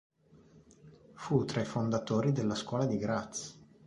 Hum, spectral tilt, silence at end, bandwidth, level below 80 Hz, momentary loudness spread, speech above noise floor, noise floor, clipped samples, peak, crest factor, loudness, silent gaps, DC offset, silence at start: none; -6 dB/octave; 0.3 s; 11 kHz; -64 dBFS; 11 LU; 29 dB; -61 dBFS; under 0.1%; -14 dBFS; 20 dB; -33 LUFS; none; under 0.1%; 0.85 s